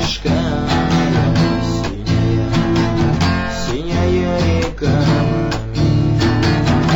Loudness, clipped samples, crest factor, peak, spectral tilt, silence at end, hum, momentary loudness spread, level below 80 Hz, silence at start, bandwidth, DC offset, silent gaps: -16 LUFS; under 0.1%; 8 dB; -8 dBFS; -6.5 dB/octave; 0 s; none; 5 LU; -28 dBFS; 0 s; 17 kHz; under 0.1%; none